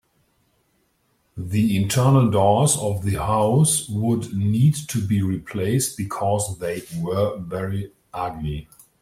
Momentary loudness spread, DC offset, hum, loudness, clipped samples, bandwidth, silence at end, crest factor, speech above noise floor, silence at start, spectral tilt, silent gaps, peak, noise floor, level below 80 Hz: 13 LU; under 0.1%; none; -21 LUFS; under 0.1%; 16 kHz; 0.4 s; 16 dB; 46 dB; 1.35 s; -5.5 dB/octave; none; -4 dBFS; -66 dBFS; -48 dBFS